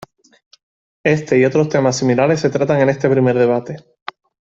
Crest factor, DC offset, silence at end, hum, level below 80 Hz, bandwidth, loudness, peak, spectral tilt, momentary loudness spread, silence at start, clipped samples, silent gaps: 16 dB; under 0.1%; 0.8 s; none; -56 dBFS; 8 kHz; -15 LUFS; -2 dBFS; -6.5 dB/octave; 18 LU; 1.05 s; under 0.1%; none